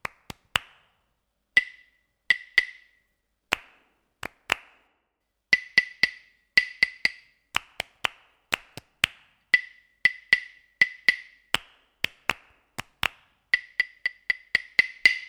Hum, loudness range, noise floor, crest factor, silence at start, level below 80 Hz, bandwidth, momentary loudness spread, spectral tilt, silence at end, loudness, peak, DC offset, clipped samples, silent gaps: none; 4 LU; -78 dBFS; 28 dB; 0.55 s; -60 dBFS; over 20 kHz; 17 LU; -0.5 dB/octave; 0.05 s; -25 LUFS; -2 dBFS; under 0.1%; under 0.1%; none